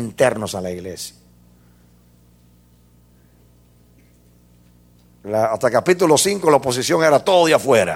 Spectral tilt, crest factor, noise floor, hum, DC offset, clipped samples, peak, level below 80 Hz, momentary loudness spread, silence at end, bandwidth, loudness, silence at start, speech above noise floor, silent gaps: -4 dB/octave; 20 dB; -52 dBFS; 60 Hz at -50 dBFS; under 0.1%; under 0.1%; 0 dBFS; -56 dBFS; 15 LU; 0 s; 16.5 kHz; -17 LUFS; 0 s; 36 dB; none